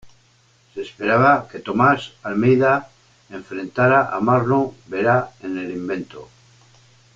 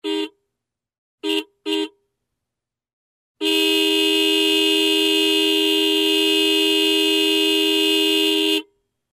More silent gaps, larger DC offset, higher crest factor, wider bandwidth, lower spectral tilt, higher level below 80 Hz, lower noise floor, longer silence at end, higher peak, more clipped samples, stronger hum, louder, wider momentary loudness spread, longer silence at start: second, none vs 0.98-1.18 s, 2.93-3.35 s; neither; first, 18 dB vs 12 dB; second, 7.6 kHz vs 14.5 kHz; first, -7.5 dB/octave vs 0 dB/octave; first, -56 dBFS vs -82 dBFS; second, -57 dBFS vs -85 dBFS; first, 0.9 s vs 0.5 s; first, -4 dBFS vs -8 dBFS; neither; neither; about the same, -19 LUFS vs -17 LUFS; first, 17 LU vs 9 LU; about the same, 0.05 s vs 0.05 s